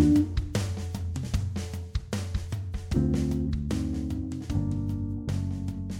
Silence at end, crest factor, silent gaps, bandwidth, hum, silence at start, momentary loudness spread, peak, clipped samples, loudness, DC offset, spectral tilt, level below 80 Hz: 0 s; 18 dB; none; 16 kHz; none; 0 s; 7 LU; -10 dBFS; under 0.1%; -30 LUFS; under 0.1%; -7 dB/octave; -36 dBFS